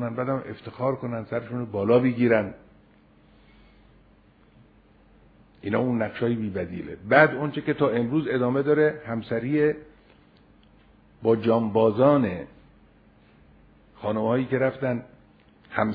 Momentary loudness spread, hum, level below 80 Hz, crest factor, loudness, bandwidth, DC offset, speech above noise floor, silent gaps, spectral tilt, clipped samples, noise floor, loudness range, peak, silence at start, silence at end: 13 LU; none; -60 dBFS; 24 dB; -24 LUFS; 5 kHz; under 0.1%; 33 dB; none; -10.5 dB/octave; under 0.1%; -57 dBFS; 7 LU; -2 dBFS; 0 s; 0 s